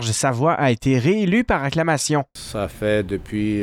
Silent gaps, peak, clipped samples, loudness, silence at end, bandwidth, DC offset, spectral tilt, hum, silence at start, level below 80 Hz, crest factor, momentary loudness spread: none; -6 dBFS; under 0.1%; -20 LUFS; 0 s; 16 kHz; under 0.1%; -5 dB/octave; none; 0 s; -42 dBFS; 14 dB; 7 LU